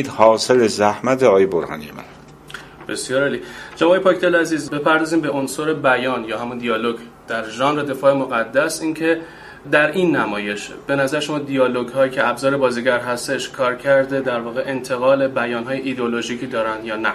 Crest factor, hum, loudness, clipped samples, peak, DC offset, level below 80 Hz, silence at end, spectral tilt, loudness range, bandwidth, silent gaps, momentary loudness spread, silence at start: 18 dB; none; -19 LUFS; under 0.1%; 0 dBFS; under 0.1%; -56 dBFS; 0 s; -4.5 dB/octave; 2 LU; 14.5 kHz; none; 11 LU; 0 s